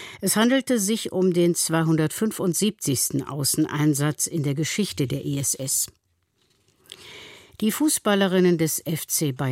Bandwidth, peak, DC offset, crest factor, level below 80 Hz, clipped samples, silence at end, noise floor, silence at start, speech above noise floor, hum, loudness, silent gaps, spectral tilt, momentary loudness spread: 16.5 kHz; -8 dBFS; under 0.1%; 16 dB; -62 dBFS; under 0.1%; 0 s; -69 dBFS; 0 s; 46 dB; none; -23 LUFS; none; -4.5 dB/octave; 7 LU